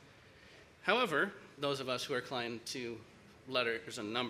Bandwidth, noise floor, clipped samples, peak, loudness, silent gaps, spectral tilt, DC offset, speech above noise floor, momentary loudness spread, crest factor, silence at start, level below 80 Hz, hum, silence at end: 15.5 kHz; -59 dBFS; under 0.1%; -14 dBFS; -36 LUFS; none; -3.5 dB/octave; under 0.1%; 23 dB; 11 LU; 24 dB; 0 s; -74 dBFS; none; 0 s